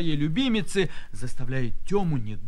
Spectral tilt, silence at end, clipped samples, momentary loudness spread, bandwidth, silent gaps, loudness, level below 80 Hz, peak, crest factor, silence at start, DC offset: -6 dB/octave; 0 s; under 0.1%; 12 LU; 11 kHz; none; -27 LUFS; -36 dBFS; -12 dBFS; 12 dB; 0 s; under 0.1%